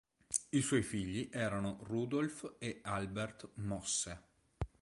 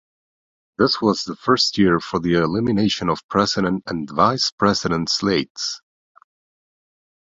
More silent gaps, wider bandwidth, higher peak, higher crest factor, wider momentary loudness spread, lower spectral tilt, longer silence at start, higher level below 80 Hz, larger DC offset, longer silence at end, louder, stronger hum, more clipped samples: second, none vs 3.24-3.29 s, 4.52-4.58 s, 5.50-5.55 s; first, 11.5 kHz vs 7.8 kHz; second, -14 dBFS vs -2 dBFS; about the same, 24 dB vs 20 dB; about the same, 10 LU vs 8 LU; about the same, -4.5 dB/octave vs -4.5 dB/octave; second, 0.3 s vs 0.8 s; second, -58 dBFS vs -50 dBFS; neither; second, 0.15 s vs 1.6 s; second, -39 LUFS vs -19 LUFS; neither; neither